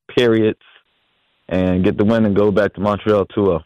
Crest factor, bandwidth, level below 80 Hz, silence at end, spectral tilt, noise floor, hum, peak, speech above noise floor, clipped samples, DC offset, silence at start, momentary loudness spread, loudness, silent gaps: 12 dB; 9.4 kHz; -46 dBFS; 0 s; -8 dB/octave; -64 dBFS; none; -4 dBFS; 48 dB; under 0.1%; under 0.1%; 0.1 s; 5 LU; -17 LUFS; none